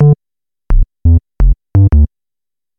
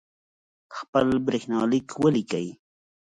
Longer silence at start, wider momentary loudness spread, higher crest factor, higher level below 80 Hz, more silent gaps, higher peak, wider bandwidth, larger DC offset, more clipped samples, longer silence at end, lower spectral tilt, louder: second, 0 s vs 0.7 s; second, 8 LU vs 14 LU; second, 10 dB vs 18 dB; first, -14 dBFS vs -58 dBFS; second, none vs 0.88-0.93 s; first, 0 dBFS vs -8 dBFS; second, 2.6 kHz vs 10.5 kHz; neither; neither; first, 0.75 s vs 0.6 s; first, -12.5 dB/octave vs -6.5 dB/octave; first, -13 LUFS vs -25 LUFS